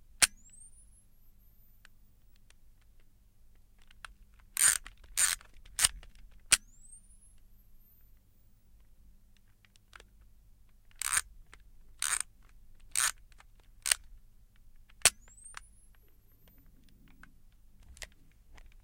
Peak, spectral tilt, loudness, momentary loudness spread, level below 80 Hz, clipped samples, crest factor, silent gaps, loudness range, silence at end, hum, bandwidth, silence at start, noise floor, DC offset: -4 dBFS; 2 dB/octave; -30 LUFS; 26 LU; -56 dBFS; under 0.1%; 34 dB; none; 10 LU; 0.8 s; none; 16.5 kHz; 0.2 s; -62 dBFS; under 0.1%